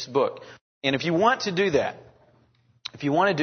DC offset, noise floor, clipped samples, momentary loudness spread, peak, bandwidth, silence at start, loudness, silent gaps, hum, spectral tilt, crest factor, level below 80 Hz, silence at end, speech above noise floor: under 0.1%; -62 dBFS; under 0.1%; 16 LU; -6 dBFS; 6.6 kHz; 0 s; -24 LUFS; 0.61-0.81 s; none; -5 dB/octave; 20 dB; -62 dBFS; 0 s; 38 dB